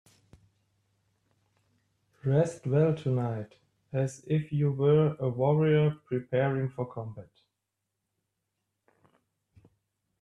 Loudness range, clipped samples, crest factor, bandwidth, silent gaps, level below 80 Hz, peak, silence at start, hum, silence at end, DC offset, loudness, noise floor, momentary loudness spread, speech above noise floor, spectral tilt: 9 LU; under 0.1%; 18 dB; 9.8 kHz; none; -66 dBFS; -12 dBFS; 2.25 s; none; 3 s; under 0.1%; -28 LUFS; -85 dBFS; 13 LU; 57 dB; -8.5 dB/octave